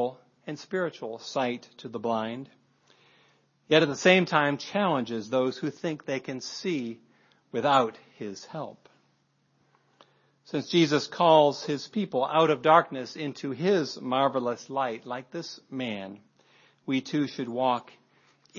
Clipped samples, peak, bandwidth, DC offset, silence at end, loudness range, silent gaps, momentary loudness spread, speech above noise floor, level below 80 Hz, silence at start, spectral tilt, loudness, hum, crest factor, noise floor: under 0.1%; -6 dBFS; 7.4 kHz; under 0.1%; 0 s; 8 LU; none; 17 LU; 43 dB; -80 dBFS; 0 s; -5 dB/octave; -27 LUFS; none; 24 dB; -70 dBFS